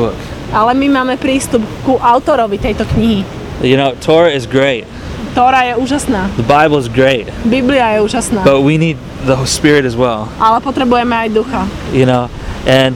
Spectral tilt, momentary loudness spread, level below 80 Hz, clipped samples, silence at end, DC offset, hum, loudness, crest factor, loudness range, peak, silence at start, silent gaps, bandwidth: -5.5 dB/octave; 8 LU; -30 dBFS; 0.2%; 0 s; under 0.1%; none; -12 LUFS; 12 dB; 1 LU; 0 dBFS; 0 s; none; 16 kHz